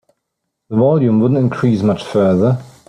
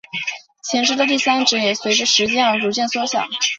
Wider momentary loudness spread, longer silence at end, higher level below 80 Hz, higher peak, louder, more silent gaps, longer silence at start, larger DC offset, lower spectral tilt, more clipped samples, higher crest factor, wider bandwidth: second, 4 LU vs 10 LU; first, 0.2 s vs 0 s; first, -52 dBFS vs -64 dBFS; about the same, -2 dBFS vs -2 dBFS; first, -14 LUFS vs -17 LUFS; neither; first, 0.7 s vs 0.15 s; neither; first, -9 dB/octave vs -1.5 dB/octave; neither; about the same, 12 dB vs 16 dB; first, 10 kHz vs 8 kHz